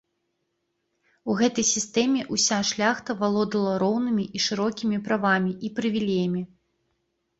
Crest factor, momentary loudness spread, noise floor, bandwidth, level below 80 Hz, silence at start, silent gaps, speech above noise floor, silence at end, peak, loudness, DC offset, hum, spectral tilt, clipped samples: 18 dB; 6 LU; -76 dBFS; 8 kHz; -64 dBFS; 1.25 s; none; 52 dB; 0.95 s; -8 dBFS; -24 LUFS; under 0.1%; none; -3.5 dB/octave; under 0.1%